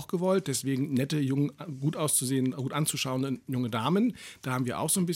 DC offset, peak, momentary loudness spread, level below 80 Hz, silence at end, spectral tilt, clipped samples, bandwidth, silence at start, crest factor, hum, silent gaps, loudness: under 0.1%; -14 dBFS; 6 LU; -68 dBFS; 0 s; -5 dB/octave; under 0.1%; 17.5 kHz; 0 s; 16 dB; none; none; -29 LUFS